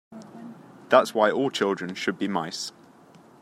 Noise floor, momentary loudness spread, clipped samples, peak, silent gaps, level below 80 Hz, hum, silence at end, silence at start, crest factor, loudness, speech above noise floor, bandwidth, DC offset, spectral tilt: -52 dBFS; 23 LU; under 0.1%; -4 dBFS; none; -74 dBFS; none; 0.7 s; 0.1 s; 22 dB; -25 LUFS; 29 dB; 15 kHz; under 0.1%; -4 dB/octave